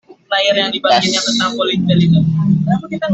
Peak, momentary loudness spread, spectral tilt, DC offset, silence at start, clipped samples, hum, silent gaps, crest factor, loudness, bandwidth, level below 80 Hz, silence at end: -2 dBFS; 5 LU; -5 dB/octave; under 0.1%; 0.1 s; under 0.1%; none; none; 12 dB; -14 LUFS; 8.2 kHz; -48 dBFS; 0 s